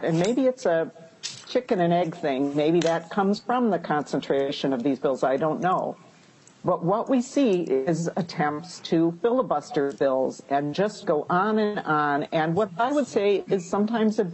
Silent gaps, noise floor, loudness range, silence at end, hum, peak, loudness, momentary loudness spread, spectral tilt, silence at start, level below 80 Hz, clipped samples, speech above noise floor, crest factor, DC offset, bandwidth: none; -54 dBFS; 1 LU; 0 s; none; -8 dBFS; -25 LUFS; 5 LU; -6 dB/octave; 0 s; -68 dBFS; under 0.1%; 30 dB; 16 dB; under 0.1%; 8.6 kHz